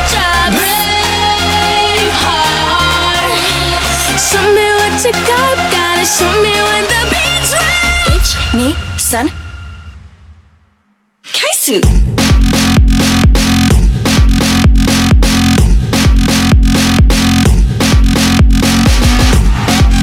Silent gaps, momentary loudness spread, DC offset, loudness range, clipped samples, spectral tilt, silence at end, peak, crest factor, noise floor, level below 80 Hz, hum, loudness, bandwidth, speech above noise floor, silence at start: none; 3 LU; under 0.1%; 5 LU; under 0.1%; -4 dB/octave; 0 s; 0 dBFS; 10 dB; -56 dBFS; -14 dBFS; none; -10 LUFS; 18.5 kHz; 46 dB; 0 s